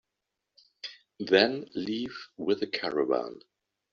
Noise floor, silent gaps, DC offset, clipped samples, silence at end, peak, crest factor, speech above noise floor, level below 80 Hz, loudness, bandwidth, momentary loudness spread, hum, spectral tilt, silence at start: -85 dBFS; none; under 0.1%; under 0.1%; 0.55 s; -6 dBFS; 26 dB; 57 dB; -72 dBFS; -29 LUFS; 7.2 kHz; 19 LU; none; -2 dB/octave; 0.85 s